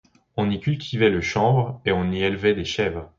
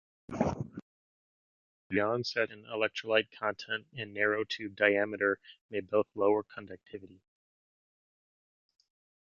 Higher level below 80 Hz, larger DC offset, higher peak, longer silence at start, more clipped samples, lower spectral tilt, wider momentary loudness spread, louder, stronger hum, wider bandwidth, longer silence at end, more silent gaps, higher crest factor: first, -44 dBFS vs -62 dBFS; neither; first, -6 dBFS vs -10 dBFS; about the same, 0.35 s vs 0.3 s; neither; about the same, -6.5 dB/octave vs -5.5 dB/octave; second, 6 LU vs 17 LU; first, -22 LUFS vs -32 LUFS; neither; about the same, 7.6 kHz vs 7.2 kHz; second, 0.15 s vs 2.15 s; second, none vs 0.82-1.90 s, 5.61-5.69 s; second, 16 dB vs 26 dB